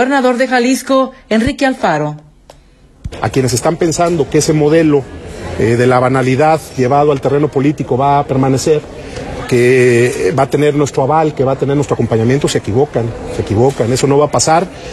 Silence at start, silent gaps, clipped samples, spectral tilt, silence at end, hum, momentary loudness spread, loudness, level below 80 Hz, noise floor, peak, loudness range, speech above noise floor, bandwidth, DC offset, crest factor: 0 s; none; under 0.1%; -5.5 dB/octave; 0 s; none; 8 LU; -12 LUFS; -38 dBFS; -43 dBFS; 0 dBFS; 3 LU; 32 dB; 14 kHz; under 0.1%; 12 dB